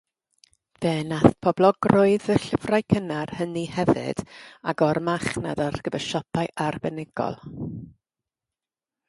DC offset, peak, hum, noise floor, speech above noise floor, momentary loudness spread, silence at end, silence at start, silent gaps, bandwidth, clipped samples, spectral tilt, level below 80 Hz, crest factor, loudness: under 0.1%; 0 dBFS; none; under -90 dBFS; over 66 dB; 13 LU; 1.2 s; 0.8 s; none; 11.5 kHz; under 0.1%; -6.5 dB/octave; -52 dBFS; 24 dB; -24 LUFS